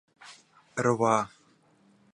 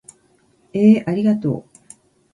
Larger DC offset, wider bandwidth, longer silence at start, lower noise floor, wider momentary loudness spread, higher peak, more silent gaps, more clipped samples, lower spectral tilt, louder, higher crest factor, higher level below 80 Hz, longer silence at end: neither; about the same, 10.5 kHz vs 11 kHz; second, 0.25 s vs 0.75 s; first, -63 dBFS vs -58 dBFS; first, 25 LU vs 14 LU; second, -8 dBFS vs -2 dBFS; neither; neither; second, -5.5 dB/octave vs -8 dB/octave; second, -28 LUFS vs -17 LUFS; about the same, 22 dB vs 18 dB; second, -70 dBFS vs -60 dBFS; first, 0.9 s vs 0.75 s